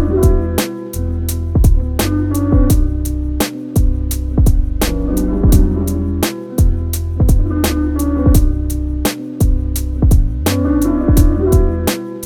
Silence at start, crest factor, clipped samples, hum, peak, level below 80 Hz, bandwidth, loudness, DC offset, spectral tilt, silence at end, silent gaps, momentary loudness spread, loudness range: 0 s; 12 dB; under 0.1%; none; 0 dBFS; -16 dBFS; 19 kHz; -16 LUFS; under 0.1%; -6.5 dB/octave; 0 s; none; 7 LU; 1 LU